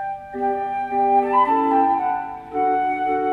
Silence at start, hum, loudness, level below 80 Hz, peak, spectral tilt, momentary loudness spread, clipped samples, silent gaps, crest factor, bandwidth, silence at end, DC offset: 0 s; none; -20 LUFS; -56 dBFS; -6 dBFS; -7 dB/octave; 9 LU; under 0.1%; none; 14 dB; 4.4 kHz; 0 s; under 0.1%